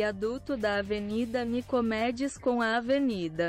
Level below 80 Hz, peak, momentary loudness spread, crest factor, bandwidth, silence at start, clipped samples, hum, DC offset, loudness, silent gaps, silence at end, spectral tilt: -54 dBFS; -18 dBFS; 4 LU; 12 dB; 13 kHz; 0 s; under 0.1%; none; under 0.1%; -30 LUFS; none; 0 s; -5.5 dB/octave